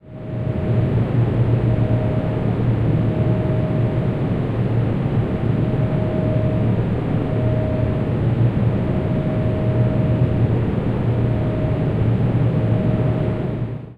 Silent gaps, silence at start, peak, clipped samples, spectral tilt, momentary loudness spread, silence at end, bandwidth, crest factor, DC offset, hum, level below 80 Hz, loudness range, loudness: none; 0.05 s; -6 dBFS; under 0.1%; -10.5 dB/octave; 3 LU; 0.05 s; 4.5 kHz; 12 dB; under 0.1%; none; -32 dBFS; 1 LU; -20 LUFS